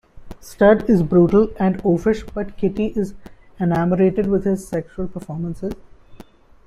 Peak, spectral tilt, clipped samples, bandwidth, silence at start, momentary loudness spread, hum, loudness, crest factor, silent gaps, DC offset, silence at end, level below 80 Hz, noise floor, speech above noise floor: -2 dBFS; -8.5 dB/octave; under 0.1%; 13.5 kHz; 0.15 s; 15 LU; none; -19 LUFS; 16 dB; none; under 0.1%; 0.45 s; -40 dBFS; -45 dBFS; 27 dB